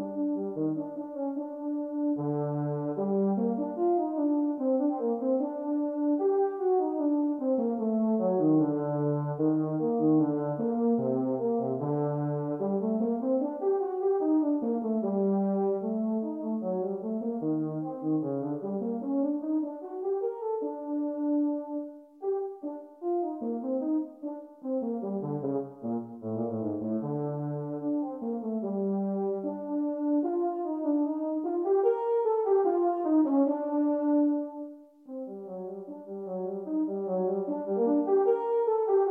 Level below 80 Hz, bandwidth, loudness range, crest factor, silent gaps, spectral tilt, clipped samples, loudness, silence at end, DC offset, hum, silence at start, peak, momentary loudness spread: -84 dBFS; 2.1 kHz; 6 LU; 14 dB; none; -13 dB/octave; under 0.1%; -29 LUFS; 0 s; under 0.1%; none; 0 s; -14 dBFS; 9 LU